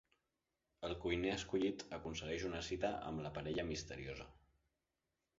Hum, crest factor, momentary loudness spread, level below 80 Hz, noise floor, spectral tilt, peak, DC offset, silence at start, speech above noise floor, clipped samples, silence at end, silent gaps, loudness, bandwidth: none; 20 dB; 10 LU; -60 dBFS; -89 dBFS; -4 dB/octave; -24 dBFS; under 0.1%; 0.8 s; 47 dB; under 0.1%; 1.05 s; none; -43 LUFS; 7.6 kHz